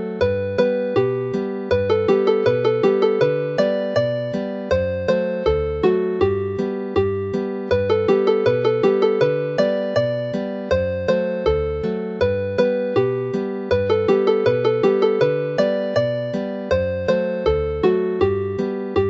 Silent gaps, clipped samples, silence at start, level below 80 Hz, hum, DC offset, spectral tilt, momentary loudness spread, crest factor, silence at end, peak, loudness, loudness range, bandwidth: none; under 0.1%; 0 s; -40 dBFS; none; under 0.1%; -7.5 dB/octave; 7 LU; 16 dB; 0 s; -4 dBFS; -20 LUFS; 2 LU; 7.4 kHz